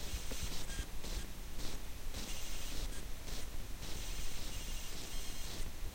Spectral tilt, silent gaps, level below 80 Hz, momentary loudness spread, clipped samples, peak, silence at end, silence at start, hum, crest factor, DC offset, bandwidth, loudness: -3 dB/octave; none; -44 dBFS; 4 LU; under 0.1%; -26 dBFS; 0 s; 0 s; none; 12 dB; under 0.1%; 16.5 kHz; -45 LUFS